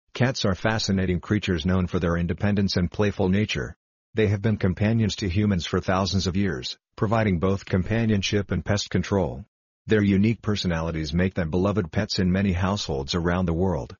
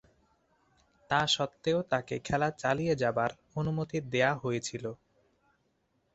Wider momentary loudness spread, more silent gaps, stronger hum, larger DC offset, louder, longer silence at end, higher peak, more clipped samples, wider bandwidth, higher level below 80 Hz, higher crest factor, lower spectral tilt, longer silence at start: about the same, 4 LU vs 6 LU; first, 3.76-4.13 s, 9.48-9.85 s vs none; neither; neither; first, -24 LUFS vs -31 LUFS; second, 0.05 s vs 1.2 s; first, -6 dBFS vs -12 dBFS; neither; second, 7.2 kHz vs 8.2 kHz; first, -42 dBFS vs -62 dBFS; about the same, 18 dB vs 20 dB; about the same, -5.5 dB/octave vs -4.5 dB/octave; second, 0.15 s vs 1.1 s